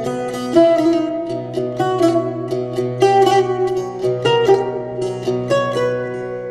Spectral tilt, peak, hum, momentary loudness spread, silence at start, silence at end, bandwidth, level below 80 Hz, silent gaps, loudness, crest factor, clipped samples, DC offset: -6 dB/octave; -2 dBFS; none; 10 LU; 0 s; 0 s; 12.5 kHz; -54 dBFS; none; -17 LUFS; 16 dB; under 0.1%; under 0.1%